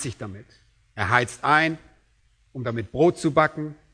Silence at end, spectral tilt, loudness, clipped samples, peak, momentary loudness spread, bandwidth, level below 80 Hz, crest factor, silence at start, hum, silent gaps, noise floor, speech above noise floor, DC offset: 0.2 s; -5.5 dB/octave; -22 LUFS; under 0.1%; -2 dBFS; 19 LU; 11 kHz; -56 dBFS; 24 dB; 0 s; none; none; -62 dBFS; 39 dB; under 0.1%